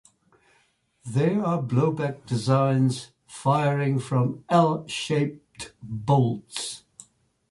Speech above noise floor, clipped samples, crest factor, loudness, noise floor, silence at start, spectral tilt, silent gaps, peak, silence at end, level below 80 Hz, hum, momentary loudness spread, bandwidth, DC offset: 42 dB; under 0.1%; 18 dB; -25 LUFS; -66 dBFS; 1.05 s; -6.5 dB/octave; none; -8 dBFS; 0.7 s; -62 dBFS; none; 14 LU; 11.5 kHz; under 0.1%